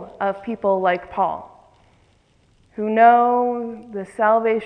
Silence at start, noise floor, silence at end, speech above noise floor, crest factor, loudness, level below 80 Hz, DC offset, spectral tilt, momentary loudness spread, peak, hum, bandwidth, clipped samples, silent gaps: 0 s; -58 dBFS; 0 s; 40 dB; 18 dB; -19 LUFS; -60 dBFS; under 0.1%; -7 dB/octave; 18 LU; -2 dBFS; none; 9.2 kHz; under 0.1%; none